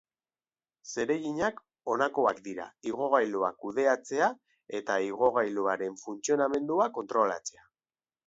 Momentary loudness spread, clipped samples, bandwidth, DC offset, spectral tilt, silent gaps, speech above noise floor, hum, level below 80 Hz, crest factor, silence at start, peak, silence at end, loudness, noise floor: 12 LU; under 0.1%; 8 kHz; under 0.1%; -4 dB/octave; none; over 61 dB; none; -74 dBFS; 20 dB; 0.85 s; -10 dBFS; 0.75 s; -30 LUFS; under -90 dBFS